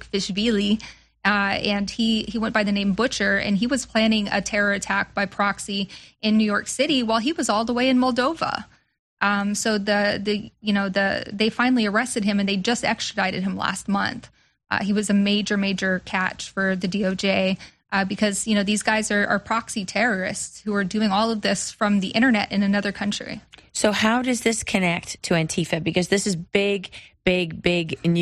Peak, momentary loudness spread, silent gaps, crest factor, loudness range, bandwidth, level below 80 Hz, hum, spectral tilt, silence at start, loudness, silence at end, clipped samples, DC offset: -4 dBFS; 6 LU; 8.99-9.17 s; 18 dB; 2 LU; 12.5 kHz; -52 dBFS; none; -4 dB/octave; 0 s; -22 LUFS; 0 s; under 0.1%; under 0.1%